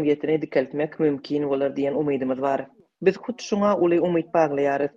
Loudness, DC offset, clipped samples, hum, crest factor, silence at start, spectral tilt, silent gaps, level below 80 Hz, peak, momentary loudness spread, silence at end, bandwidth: -23 LUFS; under 0.1%; under 0.1%; none; 16 dB; 0 s; -7 dB/octave; none; -64 dBFS; -6 dBFS; 7 LU; 0.1 s; 7.6 kHz